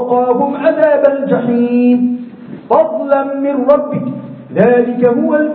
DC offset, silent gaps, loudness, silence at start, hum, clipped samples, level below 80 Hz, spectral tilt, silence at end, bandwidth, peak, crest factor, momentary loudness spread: under 0.1%; none; -12 LUFS; 0 s; none; under 0.1%; -58 dBFS; -11 dB/octave; 0 s; 4.4 kHz; 0 dBFS; 12 dB; 10 LU